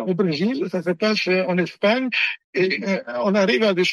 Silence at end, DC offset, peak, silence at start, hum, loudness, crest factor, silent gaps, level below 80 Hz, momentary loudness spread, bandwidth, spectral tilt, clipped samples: 0 s; under 0.1%; -6 dBFS; 0 s; none; -21 LUFS; 14 dB; 2.44-2.53 s; -68 dBFS; 5 LU; 12 kHz; -5.5 dB/octave; under 0.1%